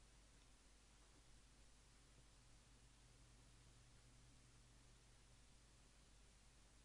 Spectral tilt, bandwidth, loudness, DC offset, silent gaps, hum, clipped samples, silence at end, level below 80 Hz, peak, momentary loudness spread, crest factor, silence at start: -3 dB/octave; 11 kHz; -70 LUFS; under 0.1%; none; none; under 0.1%; 0 s; -72 dBFS; -56 dBFS; 0 LU; 12 dB; 0 s